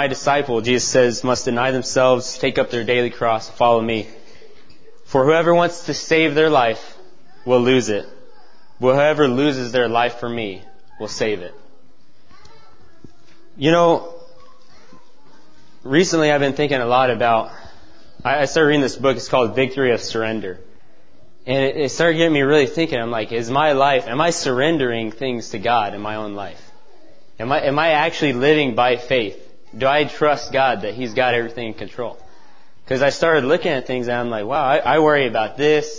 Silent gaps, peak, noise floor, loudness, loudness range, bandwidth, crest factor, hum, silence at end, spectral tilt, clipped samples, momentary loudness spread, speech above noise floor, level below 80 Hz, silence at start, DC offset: none; 0 dBFS; -56 dBFS; -18 LUFS; 5 LU; 8 kHz; 18 dB; none; 0 s; -4.5 dB/octave; under 0.1%; 12 LU; 38 dB; -54 dBFS; 0 s; 2%